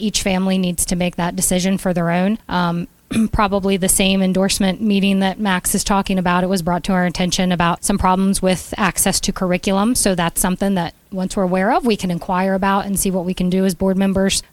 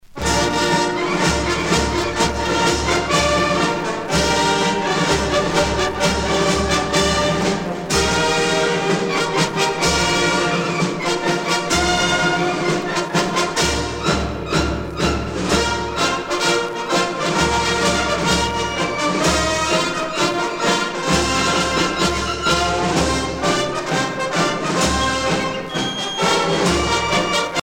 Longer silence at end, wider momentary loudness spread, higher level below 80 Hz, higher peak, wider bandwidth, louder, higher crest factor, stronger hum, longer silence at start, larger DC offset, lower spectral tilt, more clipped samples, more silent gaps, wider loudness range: about the same, 0.1 s vs 0 s; about the same, 4 LU vs 4 LU; about the same, -36 dBFS vs -34 dBFS; first, 0 dBFS vs -4 dBFS; about the same, 16 kHz vs 16.5 kHz; about the same, -17 LUFS vs -18 LUFS; about the same, 16 dB vs 16 dB; neither; about the same, 0 s vs 0.05 s; neither; about the same, -4.5 dB/octave vs -3.5 dB/octave; neither; neither; about the same, 2 LU vs 2 LU